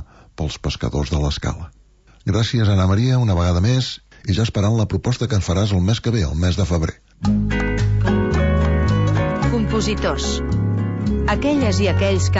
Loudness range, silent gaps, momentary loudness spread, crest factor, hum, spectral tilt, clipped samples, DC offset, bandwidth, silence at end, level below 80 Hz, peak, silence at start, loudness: 1 LU; none; 7 LU; 12 dB; none; -6 dB/octave; under 0.1%; under 0.1%; 8 kHz; 0 s; -28 dBFS; -6 dBFS; 0 s; -19 LUFS